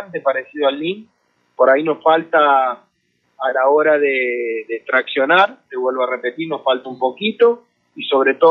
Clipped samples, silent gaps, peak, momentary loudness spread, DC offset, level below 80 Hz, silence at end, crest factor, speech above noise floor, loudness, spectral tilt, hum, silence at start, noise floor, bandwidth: under 0.1%; none; -2 dBFS; 10 LU; under 0.1%; -80 dBFS; 0 s; 16 dB; 49 dB; -17 LUFS; -6.5 dB/octave; none; 0 s; -65 dBFS; 5.6 kHz